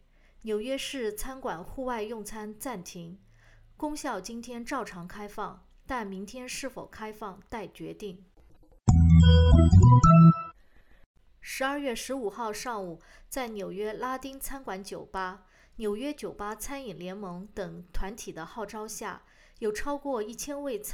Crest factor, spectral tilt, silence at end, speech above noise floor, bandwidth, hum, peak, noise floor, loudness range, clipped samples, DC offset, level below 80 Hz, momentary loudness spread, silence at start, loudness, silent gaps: 20 dB; -6.5 dB/octave; 0 s; 26 dB; 14.5 kHz; none; -8 dBFS; -56 dBFS; 17 LU; under 0.1%; under 0.1%; -38 dBFS; 22 LU; 0.45 s; -27 LUFS; 11.06-11.14 s